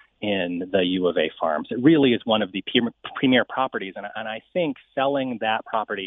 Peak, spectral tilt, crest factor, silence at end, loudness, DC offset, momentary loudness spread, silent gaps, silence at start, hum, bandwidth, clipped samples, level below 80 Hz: -4 dBFS; -9 dB/octave; 20 dB; 0 s; -23 LUFS; under 0.1%; 10 LU; none; 0.2 s; none; 4 kHz; under 0.1%; -64 dBFS